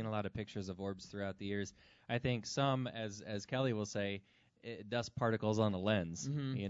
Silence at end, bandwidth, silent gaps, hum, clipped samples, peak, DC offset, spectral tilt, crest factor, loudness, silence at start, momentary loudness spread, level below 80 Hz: 0 s; 7.6 kHz; none; none; under 0.1%; -20 dBFS; under 0.1%; -5.5 dB/octave; 18 dB; -39 LUFS; 0 s; 10 LU; -68 dBFS